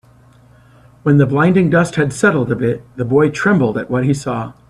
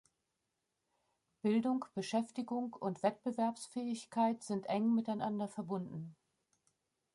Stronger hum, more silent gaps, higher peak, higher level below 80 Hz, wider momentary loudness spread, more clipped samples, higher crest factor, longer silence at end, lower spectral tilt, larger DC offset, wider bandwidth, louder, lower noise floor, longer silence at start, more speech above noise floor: neither; neither; first, 0 dBFS vs -20 dBFS; first, -48 dBFS vs -84 dBFS; about the same, 8 LU vs 8 LU; neither; about the same, 16 dB vs 18 dB; second, 0.15 s vs 1 s; about the same, -7 dB/octave vs -6 dB/octave; neither; about the same, 11.5 kHz vs 11.5 kHz; first, -15 LUFS vs -37 LUFS; second, -46 dBFS vs -86 dBFS; second, 1.05 s vs 1.45 s; second, 32 dB vs 50 dB